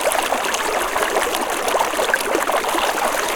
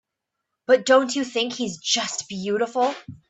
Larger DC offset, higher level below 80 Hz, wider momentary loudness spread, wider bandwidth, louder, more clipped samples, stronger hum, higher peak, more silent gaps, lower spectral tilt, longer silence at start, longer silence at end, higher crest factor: neither; first, -46 dBFS vs -68 dBFS; second, 1 LU vs 10 LU; first, 19 kHz vs 8.4 kHz; first, -19 LUFS vs -22 LUFS; neither; neither; about the same, -2 dBFS vs -4 dBFS; neither; second, -1 dB/octave vs -2.5 dB/octave; second, 0 s vs 0.7 s; second, 0 s vs 0.15 s; about the same, 18 dB vs 20 dB